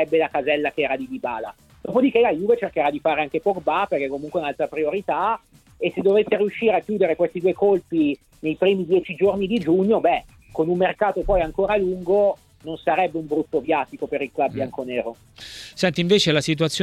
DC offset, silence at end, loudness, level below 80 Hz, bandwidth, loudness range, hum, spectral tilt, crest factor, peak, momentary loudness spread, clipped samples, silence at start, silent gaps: under 0.1%; 0 s; -22 LUFS; -46 dBFS; 13.5 kHz; 3 LU; none; -5.5 dB/octave; 16 dB; -4 dBFS; 10 LU; under 0.1%; 0 s; none